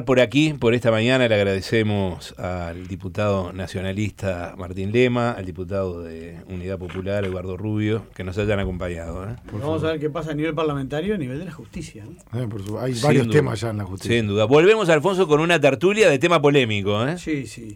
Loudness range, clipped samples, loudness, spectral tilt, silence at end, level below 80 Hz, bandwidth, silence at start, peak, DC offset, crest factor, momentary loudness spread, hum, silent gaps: 9 LU; under 0.1%; -21 LUFS; -6 dB/octave; 0 s; -46 dBFS; 16 kHz; 0 s; -6 dBFS; under 0.1%; 16 dB; 15 LU; none; none